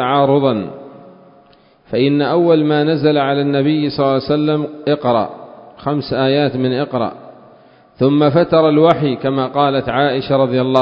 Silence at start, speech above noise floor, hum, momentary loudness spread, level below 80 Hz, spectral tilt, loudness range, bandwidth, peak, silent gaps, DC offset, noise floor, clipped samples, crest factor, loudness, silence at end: 0 s; 35 dB; none; 9 LU; -52 dBFS; -9 dB/octave; 3 LU; 5.4 kHz; 0 dBFS; none; under 0.1%; -49 dBFS; under 0.1%; 16 dB; -15 LUFS; 0 s